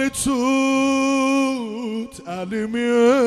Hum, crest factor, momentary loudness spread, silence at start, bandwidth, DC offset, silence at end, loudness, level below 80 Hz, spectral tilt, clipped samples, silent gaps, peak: none; 16 dB; 11 LU; 0 s; 14.5 kHz; under 0.1%; 0 s; -20 LUFS; -50 dBFS; -4 dB/octave; under 0.1%; none; -4 dBFS